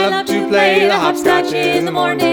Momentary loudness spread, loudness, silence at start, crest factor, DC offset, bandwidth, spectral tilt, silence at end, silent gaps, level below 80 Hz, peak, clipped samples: 4 LU; -14 LUFS; 0 s; 14 dB; under 0.1%; over 20 kHz; -4 dB/octave; 0 s; none; -52 dBFS; 0 dBFS; under 0.1%